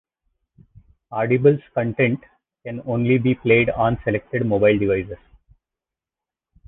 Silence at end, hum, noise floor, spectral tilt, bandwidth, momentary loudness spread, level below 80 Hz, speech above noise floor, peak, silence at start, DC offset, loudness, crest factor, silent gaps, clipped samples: 1.5 s; none; -89 dBFS; -11 dB/octave; 4 kHz; 15 LU; -48 dBFS; 69 dB; -4 dBFS; 1.1 s; under 0.1%; -20 LUFS; 18 dB; none; under 0.1%